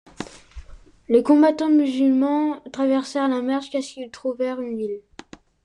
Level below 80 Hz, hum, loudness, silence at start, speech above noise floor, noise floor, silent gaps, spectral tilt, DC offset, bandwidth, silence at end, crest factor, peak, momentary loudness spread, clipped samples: -52 dBFS; none; -21 LUFS; 0.2 s; 25 dB; -45 dBFS; none; -5 dB/octave; under 0.1%; 10.5 kHz; 0.65 s; 16 dB; -4 dBFS; 16 LU; under 0.1%